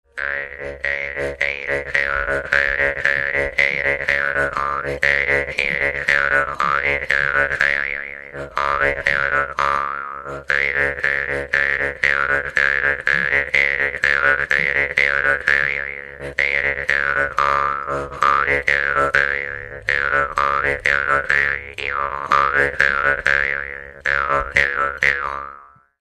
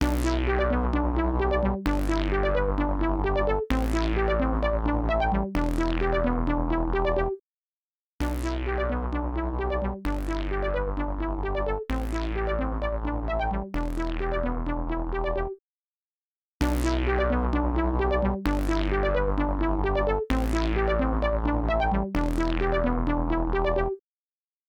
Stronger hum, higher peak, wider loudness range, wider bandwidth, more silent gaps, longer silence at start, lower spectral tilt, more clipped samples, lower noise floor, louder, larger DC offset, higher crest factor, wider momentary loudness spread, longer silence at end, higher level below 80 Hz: neither; first, 0 dBFS vs -10 dBFS; about the same, 3 LU vs 4 LU; about the same, 12.5 kHz vs 13.5 kHz; second, none vs 7.40-8.19 s, 15.59-16.60 s; first, 0.15 s vs 0 s; second, -3.5 dB/octave vs -7 dB/octave; neither; second, -43 dBFS vs under -90 dBFS; first, -18 LUFS vs -27 LUFS; neither; about the same, 20 dB vs 16 dB; first, 8 LU vs 5 LU; second, 0.35 s vs 0.7 s; second, -42 dBFS vs -30 dBFS